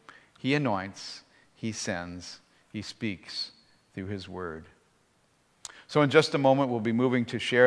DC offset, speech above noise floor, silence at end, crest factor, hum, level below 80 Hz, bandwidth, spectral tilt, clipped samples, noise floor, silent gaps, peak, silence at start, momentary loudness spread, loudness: under 0.1%; 40 dB; 0 s; 24 dB; none; -68 dBFS; 11 kHz; -5.5 dB/octave; under 0.1%; -67 dBFS; none; -4 dBFS; 0.45 s; 22 LU; -29 LUFS